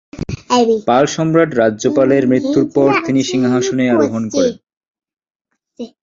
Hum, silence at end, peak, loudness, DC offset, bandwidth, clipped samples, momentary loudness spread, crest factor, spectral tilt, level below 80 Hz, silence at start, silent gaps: none; 0.15 s; -2 dBFS; -14 LUFS; under 0.1%; 7.6 kHz; under 0.1%; 5 LU; 14 dB; -5.5 dB/octave; -46 dBFS; 0.15 s; 4.77-4.81 s, 4.90-4.94 s, 5.31-5.35 s